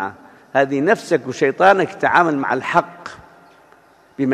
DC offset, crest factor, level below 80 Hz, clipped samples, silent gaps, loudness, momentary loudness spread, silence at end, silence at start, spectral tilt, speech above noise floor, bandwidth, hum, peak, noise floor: under 0.1%; 18 dB; -60 dBFS; under 0.1%; none; -17 LUFS; 15 LU; 0 s; 0 s; -5.5 dB/octave; 34 dB; 13.5 kHz; none; 0 dBFS; -51 dBFS